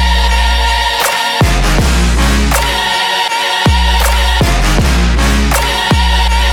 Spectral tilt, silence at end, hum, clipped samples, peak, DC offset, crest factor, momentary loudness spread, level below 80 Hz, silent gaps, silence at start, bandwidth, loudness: -4 dB/octave; 0 s; none; under 0.1%; -2 dBFS; under 0.1%; 8 dB; 1 LU; -14 dBFS; none; 0 s; 18 kHz; -11 LUFS